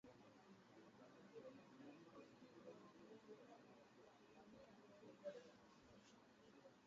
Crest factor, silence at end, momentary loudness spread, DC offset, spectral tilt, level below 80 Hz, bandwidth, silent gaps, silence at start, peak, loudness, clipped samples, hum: 22 dB; 0 s; 9 LU; under 0.1%; -4.5 dB/octave; under -90 dBFS; 7.4 kHz; none; 0.05 s; -44 dBFS; -65 LUFS; under 0.1%; none